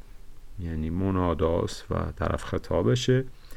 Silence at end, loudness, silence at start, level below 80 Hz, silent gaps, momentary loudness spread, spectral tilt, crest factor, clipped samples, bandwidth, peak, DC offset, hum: 0 s; -27 LUFS; 0.05 s; -40 dBFS; none; 9 LU; -6.5 dB/octave; 16 dB; under 0.1%; 13 kHz; -10 dBFS; under 0.1%; none